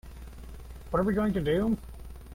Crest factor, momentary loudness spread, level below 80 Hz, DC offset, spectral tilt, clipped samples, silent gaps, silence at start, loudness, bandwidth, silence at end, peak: 16 dB; 20 LU; -42 dBFS; under 0.1%; -8 dB/octave; under 0.1%; none; 0.05 s; -29 LUFS; 16.5 kHz; 0 s; -14 dBFS